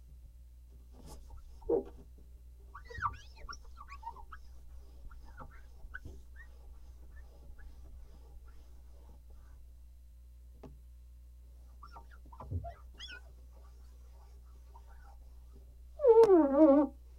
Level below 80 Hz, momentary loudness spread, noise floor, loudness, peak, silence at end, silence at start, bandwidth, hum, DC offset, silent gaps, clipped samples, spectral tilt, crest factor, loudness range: -52 dBFS; 31 LU; -54 dBFS; -28 LUFS; -12 dBFS; 0.3 s; 1.1 s; 11 kHz; 60 Hz at -55 dBFS; under 0.1%; none; under 0.1%; -7.5 dB/octave; 22 dB; 25 LU